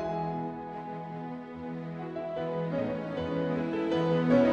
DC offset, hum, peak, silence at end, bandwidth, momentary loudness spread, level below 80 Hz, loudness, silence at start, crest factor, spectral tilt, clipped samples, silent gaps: under 0.1%; none; -12 dBFS; 0 s; 7.2 kHz; 12 LU; -60 dBFS; -32 LUFS; 0 s; 18 dB; -8.5 dB/octave; under 0.1%; none